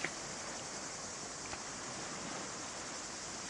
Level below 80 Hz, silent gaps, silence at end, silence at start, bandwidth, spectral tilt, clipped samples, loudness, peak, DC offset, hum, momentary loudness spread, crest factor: -68 dBFS; none; 0 s; 0 s; 11.5 kHz; -1.5 dB/octave; under 0.1%; -42 LUFS; -20 dBFS; under 0.1%; none; 1 LU; 24 dB